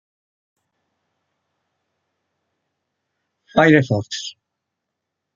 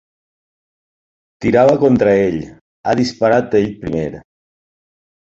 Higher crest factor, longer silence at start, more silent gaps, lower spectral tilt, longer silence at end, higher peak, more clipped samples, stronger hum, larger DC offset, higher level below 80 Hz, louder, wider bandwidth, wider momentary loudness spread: first, 22 dB vs 16 dB; first, 3.55 s vs 1.4 s; second, none vs 2.61-2.84 s; about the same, -6 dB/octave vs -7 dB/octave; about the same, 1.05 s vs 1.05 s; about the same, -2 dBFS vs -2 dBFS; neither; neither; neither; second, -60 dBFS vs -46 dBFS; about the same, -16 LUFS vs -15 LUFS; about the same, 7.6 kHz vs 8 kHz; about the same, 15 LU vs 14 LU